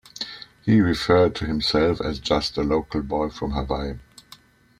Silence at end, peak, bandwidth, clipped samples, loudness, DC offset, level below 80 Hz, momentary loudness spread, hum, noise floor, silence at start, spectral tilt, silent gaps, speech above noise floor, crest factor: 0.8 s; -4 dBFS; 14.5 kHz; under 0.1%; -23 LUFS; under 0.1%; -40 dBFS; 14 LU; none; -51 dBFS; 0.15 s; -6 dB/octave; none; 29 dB; 18 dB